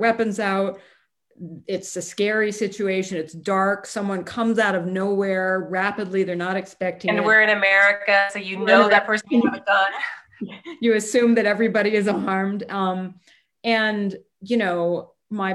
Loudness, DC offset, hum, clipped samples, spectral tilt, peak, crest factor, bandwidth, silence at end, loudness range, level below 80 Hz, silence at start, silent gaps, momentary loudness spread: -21 LUFS; under 0.1%; none; under 0.1%; -4.5 dB/octave; -2 dBFS; 20 dB; 12.5 kHz; 0 s; 7 LU; -68 dBFS; 0 s; none; 14 LU